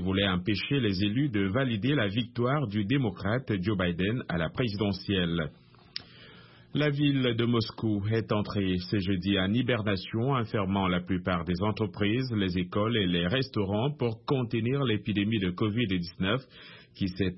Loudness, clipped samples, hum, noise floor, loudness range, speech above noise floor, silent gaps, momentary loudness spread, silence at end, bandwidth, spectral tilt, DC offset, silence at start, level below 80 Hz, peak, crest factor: -29 LUFS; under 0.1%; none; -53 dBFS; 2 LU; 25 dB; none; 4 LU; 0 s; 5.8 kHz; -10.5 dB/octave; under 0.1%; 0 s; -54 dBFS; -12 dBFS; 16 dB